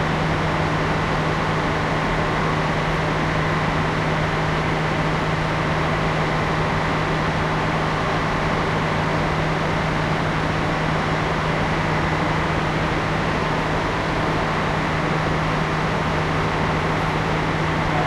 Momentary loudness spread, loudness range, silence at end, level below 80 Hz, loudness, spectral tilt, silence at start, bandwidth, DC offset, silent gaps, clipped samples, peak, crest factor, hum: 1 LU; 0 LU; 0 s; -34 dBFS; -21 LUFS; -6 dB/octave; 0 s; 11.5 kHz; under 0.1%; none; under 0.1%; -8 dBFS; 14 dB; none